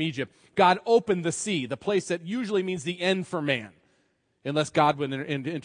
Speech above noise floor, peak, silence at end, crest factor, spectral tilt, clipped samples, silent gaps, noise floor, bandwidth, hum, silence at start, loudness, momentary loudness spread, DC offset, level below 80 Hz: 44 dB; -6 dBFS; 0.05 s; 20 dB; -4.5 dB/octave; under 0.1%; none; -70 dBFS; 10.5 kHz; none; 0 s; -26 LUFS; 8 LU; under 0.1%; -70 dBFS